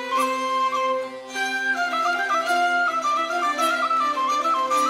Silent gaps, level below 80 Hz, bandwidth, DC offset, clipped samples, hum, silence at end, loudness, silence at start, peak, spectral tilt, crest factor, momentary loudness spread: none; -74 dBFS; 16 kHz; under 0.1%; under 0.1%; none; 0 s; -22 LUFS; 0 s; -10 dBFS; -1 dB/octave; 12 dB; 4 LU